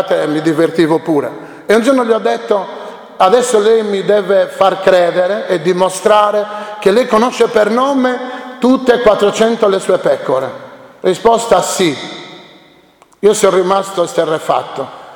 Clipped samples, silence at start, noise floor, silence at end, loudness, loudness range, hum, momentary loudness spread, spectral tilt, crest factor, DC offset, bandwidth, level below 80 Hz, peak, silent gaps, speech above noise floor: 0.1%; 0 s; -46 dBFS; 0 s; -12 LUFS; 3 LU; none; 12 LU; -4.5 dB/octave; 12 dB; under 0.1%; 19.5 kHz; -52 dBFS; 0 dBFS; none; 35 dB